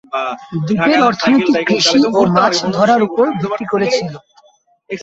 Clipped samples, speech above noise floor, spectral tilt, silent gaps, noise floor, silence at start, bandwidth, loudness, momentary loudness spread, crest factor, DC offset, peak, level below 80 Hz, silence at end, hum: under 0.1%; 39 dB; -4.5 dB/octave; none; -53 dBFS; 0.15 s; 8 kHz; -14 LUFS; 10 LU; 14 dB; under 0.1%; 0 dBFS; -54 dBFS; 0 s; none